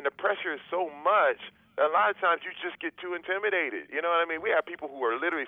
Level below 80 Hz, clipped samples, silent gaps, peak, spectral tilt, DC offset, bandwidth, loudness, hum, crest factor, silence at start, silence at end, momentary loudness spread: -76 dBFS; under 0.1%; none; -12 dBFS; -5.5 dB/octave; under 0.1%; 3.9 kHz; -28 LUFS; none; 16 dB; 0 s; 0 s; 12 LU